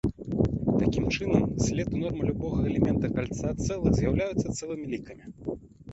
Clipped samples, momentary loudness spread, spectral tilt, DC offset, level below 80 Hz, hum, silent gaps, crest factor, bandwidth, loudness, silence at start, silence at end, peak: under 0.1%; 12 LU; -6.5 dB/octave; under 0.1%; -40 dBFS; none; none; 20 dB; 8.2 kHz; -28 LUFS; 0.05 s; 0 s; -6 dBFS